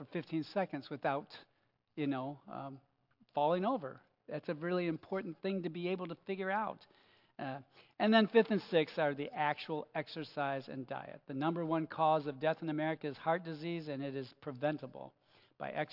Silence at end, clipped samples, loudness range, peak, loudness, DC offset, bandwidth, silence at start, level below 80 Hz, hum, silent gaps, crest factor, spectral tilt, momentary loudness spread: 0 s; under 0.1%; 6 LU; -14 dBFS; -37 LUFS; under 0.1%; 5.8 kHz; 0 s; -88 dBFS; none; none; 22 dB; -8.5 dB/octave; 14 LU